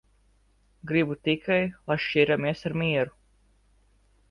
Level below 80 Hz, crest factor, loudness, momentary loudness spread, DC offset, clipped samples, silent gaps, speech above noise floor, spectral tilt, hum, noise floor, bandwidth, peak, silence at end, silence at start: -58 dBFS; 20 dB; -26 LUFS; 6 LU; under 0.1%; under 0.1%; none; 38 dB; -7.5 dB/octave; 50 Hz at -60 dBFS; -64 dBFS; 10.5 kHz; -8 dBFS; 1.2 s; 0.85 s